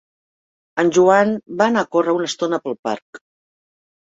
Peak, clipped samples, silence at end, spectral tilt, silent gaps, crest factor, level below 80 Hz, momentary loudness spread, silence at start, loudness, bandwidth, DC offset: -2 dBFS; under 0.1%; 0.95 s; -5 dB/octave; 2.79-2.83 s, 3.02-3.13 s; 18 dB; -64 dBFS; 13 LU; 0.75 s; -18 LUFS; 8 kHz; under 0.1%